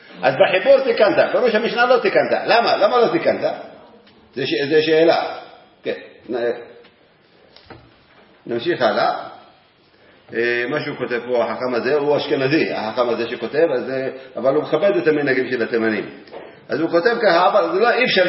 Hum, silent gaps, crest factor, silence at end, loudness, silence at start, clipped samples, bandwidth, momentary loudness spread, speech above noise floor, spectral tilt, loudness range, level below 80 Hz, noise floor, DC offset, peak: none; none; 18 dB; 0 s; -18 LUFS; 0.1 s; under 0.1%; 5.8 kHz; 14 LU; 36 dB; -8.5 dB/octave; 9 LU; -68 dBFS; -53 dBFS; under 0.1%; 0 dBFS